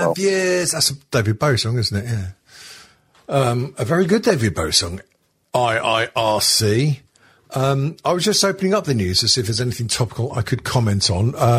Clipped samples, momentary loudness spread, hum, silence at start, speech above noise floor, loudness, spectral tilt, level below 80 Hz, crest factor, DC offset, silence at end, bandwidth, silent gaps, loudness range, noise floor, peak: under 0.1%; 8 LU; none; 0 s; 31 dB; -19 LUFS; -4 dB/octave; -46 dBFS; 18 dB; under 0.1%; 0 s; 16 kHz; none; 3 LU; -50 dBFS; 0 dBFS